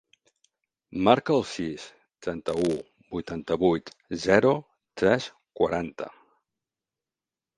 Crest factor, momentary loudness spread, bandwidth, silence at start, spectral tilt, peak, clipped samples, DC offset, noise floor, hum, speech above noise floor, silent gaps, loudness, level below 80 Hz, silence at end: 24 dB; 18 LU; 11.5 kHz; 0.9 s; -6 dB/octave; -2 dBFS; under 0.1%; under 0.1%; under -90 dBFS; none; over 65 dB; none; -26 LUFS; -56 dBFS; 1.5 s